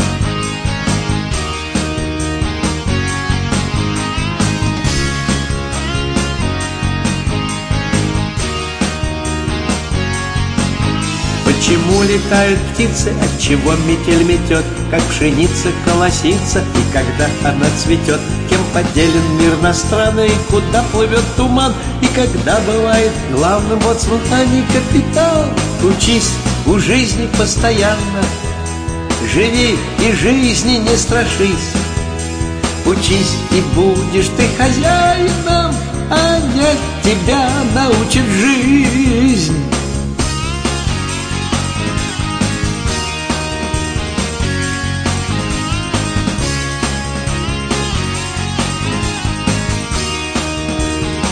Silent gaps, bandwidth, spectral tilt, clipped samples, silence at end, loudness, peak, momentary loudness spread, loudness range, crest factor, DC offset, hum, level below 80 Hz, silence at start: none; 10.5 kHz; -4.5 dB/octave; under 0.1%; 0 s; -14 LUFS; 0 dBFS; 6 LU; 5 LU; 14 dB; under 0.1%; none; -24 dBFS; 0 s